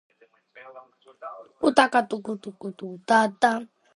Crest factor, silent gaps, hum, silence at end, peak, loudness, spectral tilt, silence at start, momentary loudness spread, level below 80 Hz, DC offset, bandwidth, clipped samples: 26 dB; none; none; 0.3 s; 0 dBFS; -23 LUFS; -4 dB/octave; 0.55 s; 21 LU; -70 dBFS; under 0.1%; 11.5 kHz; under 0.1%